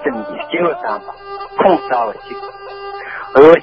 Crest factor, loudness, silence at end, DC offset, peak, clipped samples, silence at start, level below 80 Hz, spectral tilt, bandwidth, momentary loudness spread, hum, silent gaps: 14 dB; -15 LUFS; 0 s; under 0.1%; 0 dBFS; 0.4%; 0 s; -50 dBFS; -7.5 dB/octave; 5.6 kHz; 18 LU; none; none